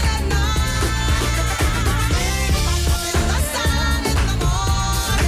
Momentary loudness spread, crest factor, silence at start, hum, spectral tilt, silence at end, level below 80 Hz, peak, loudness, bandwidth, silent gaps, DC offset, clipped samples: 1 LU; 8 dB; 0 s; none; -4 dB/octave; 0 s; -22 dBFS; -10 dBFS; -19 LUFS; 19.5 kHz; none; under 0.1%; under 0.1%